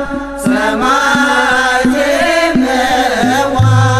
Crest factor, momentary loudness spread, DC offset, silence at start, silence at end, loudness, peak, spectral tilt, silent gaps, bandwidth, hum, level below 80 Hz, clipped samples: 10 dB; 3 LU; under 0.1%; 0 s; 0 s; -11 LUFS; 0 dBFS; -5 dB/octave; none; 14.5 kHz; none; -34 dBFS; under 0.1%